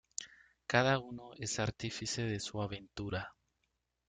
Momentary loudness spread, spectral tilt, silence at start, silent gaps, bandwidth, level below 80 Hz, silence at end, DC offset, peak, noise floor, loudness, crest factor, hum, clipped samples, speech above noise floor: 17 LU; -4 dB/octave; 0.2 s; none; 9.6 kHz; -62 dBFS; 0.75 s; under 0.1%; -12 dBFS; -83 dBFS; -37 LUFS; 26 dB; none; under 0.1%; 47 dB